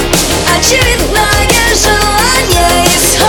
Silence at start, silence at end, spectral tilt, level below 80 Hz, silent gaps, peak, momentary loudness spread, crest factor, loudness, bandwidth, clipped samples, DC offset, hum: 0 s; 0 s; -2.5 dB/octave; -18 dBFS; none; 0 dBFS; 2 LU; 8 dB; -8 LUFS; 20 kHz; 0.2%; under 0.1%; none